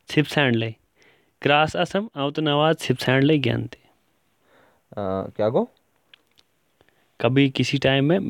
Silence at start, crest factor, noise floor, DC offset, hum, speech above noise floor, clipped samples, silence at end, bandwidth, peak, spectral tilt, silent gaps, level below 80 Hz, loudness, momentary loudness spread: 0.1 s; 20 dB; -67 dBFS; under 0.1%; none; 46 dB; under 0.1%; 0 s; 16 kHz; -4 dBFS; -6 dB/octave; none; -58 dBFS; -22 LUFS; 10 LU